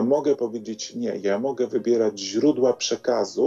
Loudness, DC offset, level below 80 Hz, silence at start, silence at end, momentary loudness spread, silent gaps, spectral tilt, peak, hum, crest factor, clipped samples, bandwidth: -24 LUFS; under 0.1%; -76 dBFS; 0 s; 0 s; 8 LU; none; -4.5 dB/octave; -8 dBFS; none; 14 dB; under 0.1%; 7.8 kHz